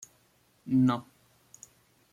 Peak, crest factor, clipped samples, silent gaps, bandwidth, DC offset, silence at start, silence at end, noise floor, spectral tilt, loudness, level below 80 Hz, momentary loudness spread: -16 dBFS; 16 dB; under 0.1%; none; 11 kHz; under 0.1%; 0.65 s; 1.1 s; -67 dBFS; -7 dB/octave; -28 LUFS; -70 dBFS; 26 LU